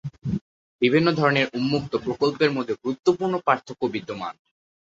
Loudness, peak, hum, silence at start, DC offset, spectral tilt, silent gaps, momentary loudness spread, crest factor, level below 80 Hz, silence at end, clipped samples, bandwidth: -23 LUFS; -4 dBFS; none; 0.05 s; under 0.1%; -6.5 dB/octave; 0.41-0.79 s; 11 LU; 20 dB; -56 dBFS; 0.65 s; under 0.1%; 7.8 kHz